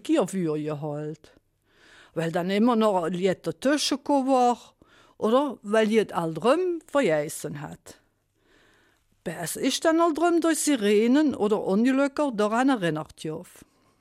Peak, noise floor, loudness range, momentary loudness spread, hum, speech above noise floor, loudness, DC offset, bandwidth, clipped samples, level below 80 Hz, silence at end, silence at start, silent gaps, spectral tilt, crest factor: -10 dBFS; -68 dBFS; 6 LU; 13 LU; none; 44 dB; -24 LUFS; under 0.1%; 15.5 kHz; under 0.1%; -66 dBFS; 0.55 s; 0.05 s; none; -5 dB/octave; 14 dB